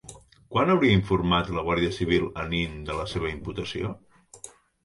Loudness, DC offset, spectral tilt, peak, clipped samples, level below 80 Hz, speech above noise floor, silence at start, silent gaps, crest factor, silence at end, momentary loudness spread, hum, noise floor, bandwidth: -26 LUFS; under 0.1%; -6 dB/octave; -8 dBFS; under 0.1%; -44 dBFS; 24 dB; 0.05 s; none; 18 dB; 0.35 s; 23 LU; none; -49 dBFS; 11.5 kHz